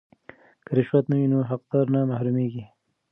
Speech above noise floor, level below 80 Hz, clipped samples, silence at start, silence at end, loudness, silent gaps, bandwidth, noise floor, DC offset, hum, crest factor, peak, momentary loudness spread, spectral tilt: 28 dB; -68 dBFS; under 0.1%; 0.7 s; 0.45 s; -24 LUFS; none; 3.8 kHz; -51 dBFS; under 0.1%; none; 18 dB; -8 dBFS; 5 LU; -12 dB/octave